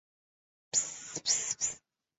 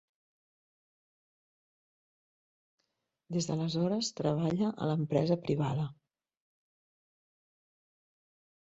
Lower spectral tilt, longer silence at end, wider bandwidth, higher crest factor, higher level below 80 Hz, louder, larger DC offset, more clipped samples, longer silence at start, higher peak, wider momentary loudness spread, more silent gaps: second, 1 dB/octave vs -6.5 dB/octave; second, 0.4 s vs 2.7 s; about the same, 8.4 kHz vs 8 kHz; about the same, 22 dB vs 20 dB; about the same, -72 dBFS vs -70 dBFS; about the same, -31 LUFS vs -32 LUFS; neither; neither; second, 0.75 s vs 3.3 s; about the same, -16 dBFS vs -16 dBFS; about the same, 8 LU vs 6 LU; neither